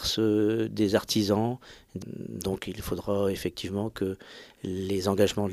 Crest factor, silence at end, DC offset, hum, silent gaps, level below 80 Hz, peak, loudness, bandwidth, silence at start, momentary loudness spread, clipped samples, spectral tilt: 20 dB; 0 s; under 0.1%; none; none; -54 dBFS; -10 dBFS; -28 LUFS; 15.5 kHz; 0 s; 15 LU; under 0.1%; -5.5 dB/octave